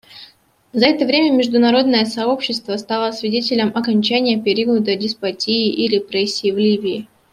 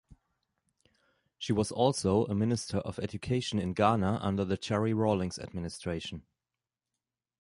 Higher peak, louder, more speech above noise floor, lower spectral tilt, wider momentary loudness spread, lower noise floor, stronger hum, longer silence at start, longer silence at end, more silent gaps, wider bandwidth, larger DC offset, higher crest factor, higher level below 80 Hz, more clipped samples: first, -2 dBFS vs -10 dBFS; first, -17 LUFS vs -31 LUFS; second, 32 dB vs over 60 dB; about the same, -5 dB/octave vs -6 dB/octave; second, 7 LU vs 11 LU; second, -48 dBFS vs under -90 dBFS; neither; about the same, 0.1 s vs 0.1 s; second, 0.3 s vs 1.2 s; neither; about the same, 11.5 kHz vs 11.5 kHz; neither; second, 16 dB vs 22 dB; second, -62 dBFS vs -54 dBFS; neither